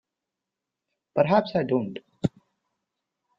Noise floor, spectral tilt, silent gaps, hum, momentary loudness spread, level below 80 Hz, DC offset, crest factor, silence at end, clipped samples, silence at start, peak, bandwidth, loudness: -86 dBFS; -8 dB/octave; none; none; 10 LU; -64 dBFS; under 0.1%; 22 dB; 1.1 s; under 0.1%; 1.15 s; -6 dBFS; 7.8 kHz; -25 LUFS